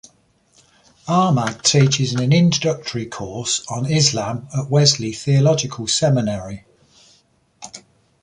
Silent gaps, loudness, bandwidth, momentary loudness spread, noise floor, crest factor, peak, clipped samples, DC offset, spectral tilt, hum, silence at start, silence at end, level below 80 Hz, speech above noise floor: none; -18 LUFS; 11 kHz; 18 LU; -59 dBFS; 18 dB; 0 dBFS; under 0.1%; under 0.1%; -4.5 dB/octave; none; 1.05 s; 0.45 s; -52 dBFS; 41 dB